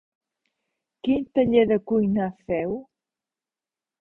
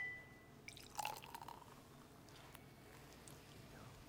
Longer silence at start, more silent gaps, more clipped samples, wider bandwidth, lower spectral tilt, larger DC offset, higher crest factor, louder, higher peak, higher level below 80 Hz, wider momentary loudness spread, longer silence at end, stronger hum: first, 1.05 s vs 0 s; neither; neither; second, 4 kHz vs 18 kHz; first, -10 dB/octave vs -3 dB/octave; neither; second, 20 dB vs 28 dB; first, -23 LUFS vs -54 LUFS; first, -6 dBFS vs -26 dBFS; first, -56 dBFS vs -72 dBFS; about the same, 12 LU vs 13 LU; first, 1.2 s vs 0 s; neither